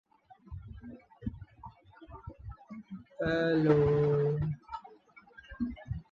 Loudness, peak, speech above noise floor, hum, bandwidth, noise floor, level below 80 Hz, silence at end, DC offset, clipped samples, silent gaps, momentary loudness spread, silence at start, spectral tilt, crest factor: -31 LUFS; -12 dBFS; 31 dB; none; 6.8 kHz; -58 dBFS; -52 dBFS; 0.1 s; under 0.1%; under 0.1%; none; 25 LU; 0.5 s; -9 dB/octave; 22 dB